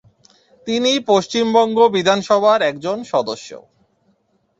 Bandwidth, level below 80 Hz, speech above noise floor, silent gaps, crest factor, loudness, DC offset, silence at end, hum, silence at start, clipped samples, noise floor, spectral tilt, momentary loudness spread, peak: 8 kHz; -62 dBFS; 46 dB; none; 16 dB; -16 LUFS; under 0.1%; 1 s; none; 0.65 s; under 0.1%; -63 dBFS; -4 dB/octave; 13 LU; -2 dBFS